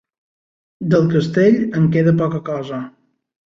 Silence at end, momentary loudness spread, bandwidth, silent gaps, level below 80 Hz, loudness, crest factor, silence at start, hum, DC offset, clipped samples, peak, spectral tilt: 0.6 s; 13 LU; 7.4 kHz; none; -56 dBFS; -16 LUFS; 14 dB; 0.8 s; none; under 0.1%; under 0.1%; -2 dBFS; -8.5 dB/octave